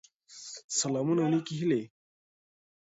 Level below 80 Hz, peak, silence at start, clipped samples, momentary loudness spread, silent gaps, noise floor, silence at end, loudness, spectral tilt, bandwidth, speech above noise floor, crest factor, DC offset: -76 dBFS; -16 dBFS; 0.3 s; under 0.1%; 17 LU; 0.64-0.69 s; -49 dBFS; 1.05 s; -30 LUFS; -4.5 dB/octave; 8 kHz; 20 dB; 16 dB; under 0.1%